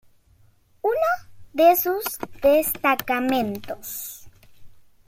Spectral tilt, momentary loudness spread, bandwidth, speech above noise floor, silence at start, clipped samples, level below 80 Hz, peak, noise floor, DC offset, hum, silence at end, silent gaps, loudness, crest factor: -3.5 dB/octave; 15 LU; 16.5 kHz; 34 dB; 0.85 s; under 0.1%; -56 dBFS; -6 dBFS; -57 dBFS; under 0.1%; none; 0.25 s; none; -22 LUFS; 18 dB